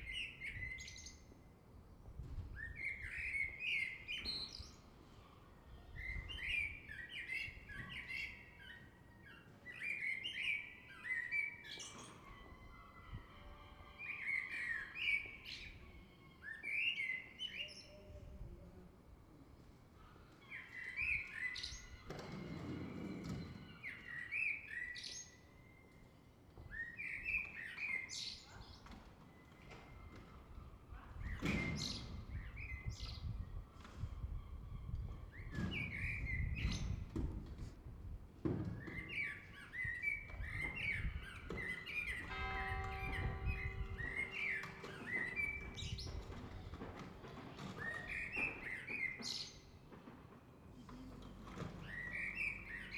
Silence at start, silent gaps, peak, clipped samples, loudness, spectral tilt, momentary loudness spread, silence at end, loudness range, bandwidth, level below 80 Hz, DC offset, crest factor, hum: 0 s; none; -26 dBFS; under 0.1%; -44 LUFS; -4 dB/octave; 21 LU; 0 s; 5 LU; 20 kHz; -54 dBFS; under 0.1%; 20 dB; none